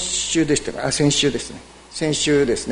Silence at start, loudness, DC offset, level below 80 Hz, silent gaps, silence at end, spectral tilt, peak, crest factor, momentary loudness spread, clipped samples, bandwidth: 0 s; -19 LUFS; under 0.1%; -44 dBFS; none; 0 s; -3.5 dB/octave; -4 dBFS; 16 dB; 15 LU; under 0.1%; 11 kHz